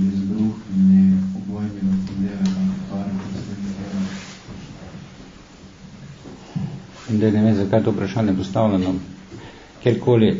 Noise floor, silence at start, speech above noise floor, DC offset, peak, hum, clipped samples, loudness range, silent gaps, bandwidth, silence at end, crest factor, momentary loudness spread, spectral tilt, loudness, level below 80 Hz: -43 dBFS; 0 s; 25 dB; under 0.1%; -4 dBFS; none; under 0.1%; 12 LU; none; 7.6 kHz; 0 s; 18 dB; 22 LU; -8 dB/octave; -21 LUFS; -48 dBFS